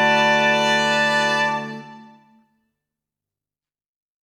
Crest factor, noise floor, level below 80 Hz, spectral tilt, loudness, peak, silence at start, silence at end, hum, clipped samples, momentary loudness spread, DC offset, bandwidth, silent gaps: 16 dB; under -90 dBFS; -74 dBFS; -3 dB/octave; -17 LUFS; -6 dBFS; 0 s; 2.2 s; none; under 0.1%; 14 LU; under 0.1%; 15.5 kHz; none